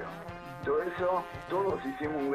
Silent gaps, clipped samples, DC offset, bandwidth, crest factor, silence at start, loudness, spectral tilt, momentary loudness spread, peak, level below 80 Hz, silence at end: none; under 0.1%; under 0.1%; 15 kHz; 14 dB; 0 s; -33 LUFS; -7 dB/octave; 11 LU; -18 dBFS; -58 dBFS; 0 s